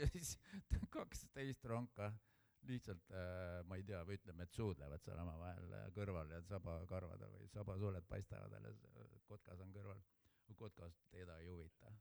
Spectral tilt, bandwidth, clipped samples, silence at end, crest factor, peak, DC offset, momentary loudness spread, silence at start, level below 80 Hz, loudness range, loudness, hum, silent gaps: -6 dB/octave; over 20 kHz; under 0.1%; 0 s; 22 dB; -28 dBFS; under 0.1%; 13 LU; 0 s; -58 dBFS; 8 LU; -52 LUFS; none; none